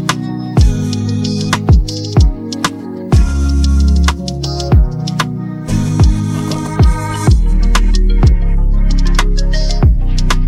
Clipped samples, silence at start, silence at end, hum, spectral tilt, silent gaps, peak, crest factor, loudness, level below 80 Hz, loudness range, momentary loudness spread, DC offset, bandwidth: under 0.1%; 0 s; 0 s; none; -6 dB/octave; none; 0 dBFS; 10 dB; -14 LUFS; -12 dBFS; 1 LU; 6 LU; under 0.1%; 12.5 kHz